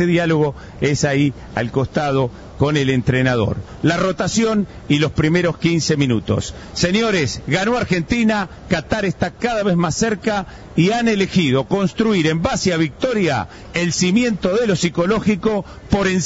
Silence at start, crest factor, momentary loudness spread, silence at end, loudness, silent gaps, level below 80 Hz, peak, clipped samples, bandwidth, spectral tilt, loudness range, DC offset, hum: 0 s; 16 dB; 6 LU; 0 s; -18 LUFS; none; -40 dBFS; -2 dBFS; under 0.1%; 8 kHz; -5.5 dB/octave; 1 LU; under 0.1%; none